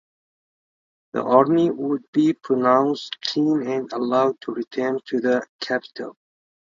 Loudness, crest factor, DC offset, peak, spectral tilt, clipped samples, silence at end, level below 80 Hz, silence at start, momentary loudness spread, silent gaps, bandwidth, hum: -22 LUFS; 22 dB; under 0.1%; 0 dBFS; -6 dB/octave; under 0.1%; 0.5 s; -70 dBFS; 1.15 s; 11 LU; 2.08-2.13 s, 5.49-5.59 s; 7.6 kHz; none